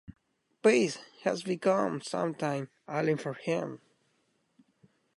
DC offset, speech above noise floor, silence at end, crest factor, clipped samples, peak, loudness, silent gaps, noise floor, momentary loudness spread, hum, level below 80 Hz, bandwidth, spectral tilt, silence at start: under 0.1%; 44 dB; 1.4 s; 20 dB; under 0.1%; -12 dBFS; -31 LUFS; none; -74 dBFS; 10 LU; none; -72 dBFS; 11.5 kHz; -5.5 dB/octave; 0.1 s